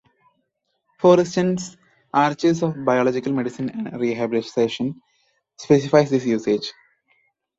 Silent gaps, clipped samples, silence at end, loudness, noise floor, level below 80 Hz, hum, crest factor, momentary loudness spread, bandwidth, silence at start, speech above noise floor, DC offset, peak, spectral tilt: none; under 0.1%; 0.85 s; -20 LUFS; -73 dBFS; -62 dBFS; none; 20 dB; 12 LU; 8 kHz; 1 s; 54 dB; under 0.1%; -2 dBFS; -6 dB/octave